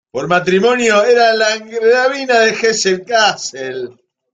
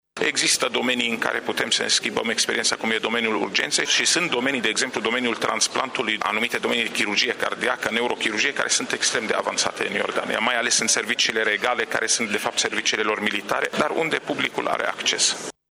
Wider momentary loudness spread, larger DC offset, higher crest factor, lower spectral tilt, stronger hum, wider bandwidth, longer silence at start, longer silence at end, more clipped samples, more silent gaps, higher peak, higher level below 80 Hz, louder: first, 12 LU vs 5 LU; neither; about the same, 12 dB vs 16 dB; first, -3 dB/octave vs -1 dB/octave; neither; second, 9.4 kHz vs 16.5 kHz; about the same, 0.15 s vs 0.15 s; first, 0.45 s vs 0.2 s; neither; neither; first, 0 dBFS vs -6 dBFS; first, -60 dBFS vs -66 dBFS; first, -13 LUFS vs -21 LUFS